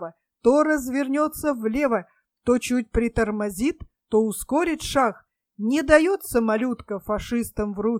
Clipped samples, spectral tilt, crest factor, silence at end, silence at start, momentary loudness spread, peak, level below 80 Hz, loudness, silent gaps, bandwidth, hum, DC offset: under 0.1%; -5 dB/octave; 20 dB; 0 s; 0 s; 10 LU; -4 dBFS; -42 dBFS; -23 LUFS; none; 16.5 kHz; none; under 0.1%